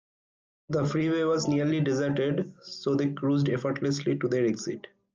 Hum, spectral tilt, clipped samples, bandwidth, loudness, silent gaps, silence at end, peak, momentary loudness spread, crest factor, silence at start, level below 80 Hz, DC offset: none; -6.5 dB/octave; under 0.1%; 9.2 kHz; -28 LUFS; none; 0.35 s; -16 dBFS; 8 LU; 12 dB; 0.7 s; -64 dBFS; under 0.1%